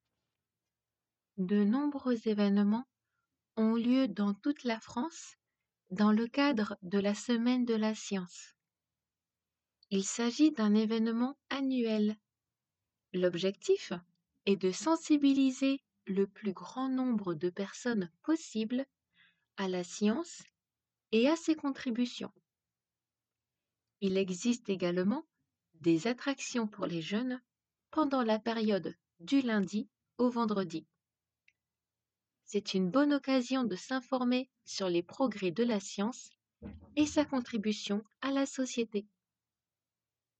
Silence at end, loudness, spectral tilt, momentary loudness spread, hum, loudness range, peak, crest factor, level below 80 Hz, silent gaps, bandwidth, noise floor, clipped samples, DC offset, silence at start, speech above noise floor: 1.35 s; -33 LUFS; -5.5 dB/octave; 11 LU; none; 4 LU; -16 dBFS; 18 dB; -74 dBFS; none; 8.8 kHz; under -90 dBFS; under 0.1%; under 0.1%; 1.35 s; over 58 dB